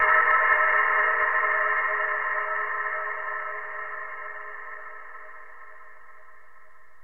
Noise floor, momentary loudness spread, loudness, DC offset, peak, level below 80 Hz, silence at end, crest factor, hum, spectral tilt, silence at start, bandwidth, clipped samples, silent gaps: -56 dBFS; 21 LU; -23 LUFS; 0.8%; -8 dBFS; -64 dBFS; 0.9 s; 18 dB; none; -3.5 dB/octave; 0 s; 3.9 kHz; under 0.1%; none